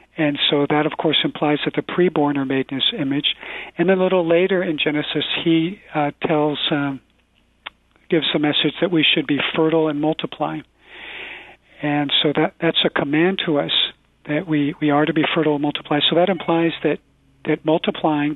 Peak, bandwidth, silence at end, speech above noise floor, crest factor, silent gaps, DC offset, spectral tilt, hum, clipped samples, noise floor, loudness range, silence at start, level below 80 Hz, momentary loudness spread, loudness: -4 dBFS; 4.2 kHz; 0 s; 41 dB; 16 dB; none; under 0.1%; -8 dB/octave; none; under 0.1%; -60 dBFS; 3 LU; 0.15 s; -58 dBFS; 11 LU; -19 LUFS